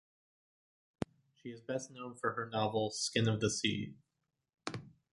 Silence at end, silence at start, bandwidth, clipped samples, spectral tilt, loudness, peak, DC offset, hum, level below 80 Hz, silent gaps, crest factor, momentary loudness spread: 0.25 s; 1 s; 11.5 kHz; under 0.1%; -4 dB/octave; -37 LUFS; -18 dBFS; under 0.1%; none; -68 dBFS; none; 22 dB; 15 LU